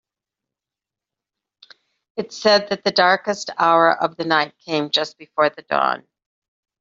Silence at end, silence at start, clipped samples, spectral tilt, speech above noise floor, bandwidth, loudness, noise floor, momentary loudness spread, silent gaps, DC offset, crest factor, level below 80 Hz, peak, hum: 0.8 s; 2.15 s; under 0.1%; -3.5 dB/octave; 69 dB; 7.8 kHz; -19 LUFS; -88 dBFS; 11 LU; none; under 0.1%; 18 dB; -70 dBFS; -2 dBFS; none